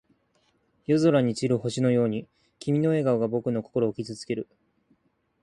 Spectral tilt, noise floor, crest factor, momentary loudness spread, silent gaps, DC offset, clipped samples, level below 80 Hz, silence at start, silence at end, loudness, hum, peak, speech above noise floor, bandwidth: -7 dB/octave; -70 dBFS; 18 dB; 13 LU; none; under 0.1%; under 0.1%; -64 dBFS; 0.9 s; 1 s; -26 LUFS; none; -10 dBFS; 45 dB; 11 kHz